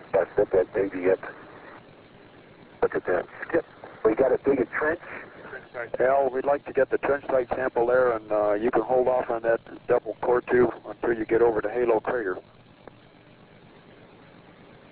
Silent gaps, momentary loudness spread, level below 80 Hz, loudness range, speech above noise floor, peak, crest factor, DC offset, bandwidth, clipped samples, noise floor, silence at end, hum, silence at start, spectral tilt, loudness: none; 14 LU; -56 dBFS; 5 LU; 28 dB; -8 dBFS; 18 dB; under 0.1%; 4 kHz; under 0.1%; -52 dBFS; 2.5 s; none; 0 s; -10 dB/octave; -25 LUFS